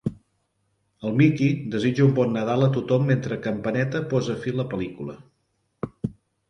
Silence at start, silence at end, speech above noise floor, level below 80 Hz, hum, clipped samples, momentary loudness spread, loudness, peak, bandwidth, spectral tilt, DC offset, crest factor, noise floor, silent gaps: 0.05 s; 0.4 s; 49 dB; -56 dBFS; none; under 0.1%; 14 LU; -24 LUFS; -6 dBFS; 7 kHz; -8 dB/octave; under 0.1%; 18 dB; -72 dBFS; none